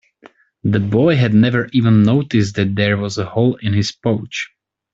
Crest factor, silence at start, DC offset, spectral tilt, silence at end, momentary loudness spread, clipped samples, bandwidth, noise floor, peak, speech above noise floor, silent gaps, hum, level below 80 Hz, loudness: 14 dB; 0.25 s; under 0.1%; -7 dB/octave; 0.5 s; 9 LU; under 0.1%; 7.8 kHz; -48 dBFS; -2 dBFS; 33 dB; none; none; -50 dBFS; -16 LUFS